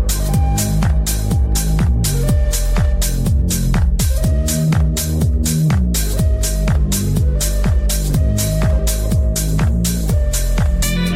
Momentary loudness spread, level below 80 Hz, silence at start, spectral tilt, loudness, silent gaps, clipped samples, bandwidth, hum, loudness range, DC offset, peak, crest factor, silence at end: 2 LU; -16 dBFS; 0 s; -5 dB/octave; -17 LUFS; none; under 0.1%; 16.5 kHz; none; 1 LU; under 0.1%; -4 dBFS; 10 dB; 0 s